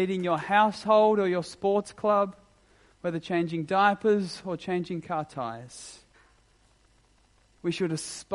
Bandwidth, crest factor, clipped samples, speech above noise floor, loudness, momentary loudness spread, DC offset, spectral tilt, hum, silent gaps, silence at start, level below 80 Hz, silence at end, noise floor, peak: 11.5 kHz; 20 dB; under 0.1%; 37 dB; -27 LUFS; 13 LU; under 0.1%; -5.5 dB/octave; none; none; 0 s; -66 dBFS; 0 s; -63 dBFS; -8 dBFS